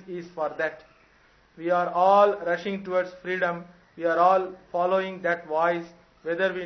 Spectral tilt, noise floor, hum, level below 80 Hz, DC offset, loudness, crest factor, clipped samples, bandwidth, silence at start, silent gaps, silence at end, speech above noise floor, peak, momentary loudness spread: -6.5 dB/octave; -59 dBFS; none; -68 dBFS; under 0.1%; -25 LUFS; 20 dB; under 0.1%; 6.4 kHz; 0.05 s; none; 0 s; 35 dB; -6 dBFS; 13 LU